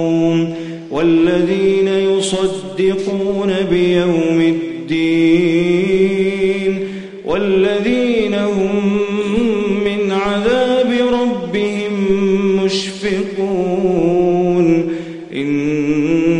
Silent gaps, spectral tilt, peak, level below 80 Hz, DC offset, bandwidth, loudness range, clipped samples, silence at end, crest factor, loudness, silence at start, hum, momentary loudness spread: none; -6.5 dB/octave; -2 dBFS; -46 dBFS; under 0.1%; 10.5 kHz; 2 LU; under 0.1%; 0 s; 12 dB; -15 LUFS; 0 s; none; 6 LU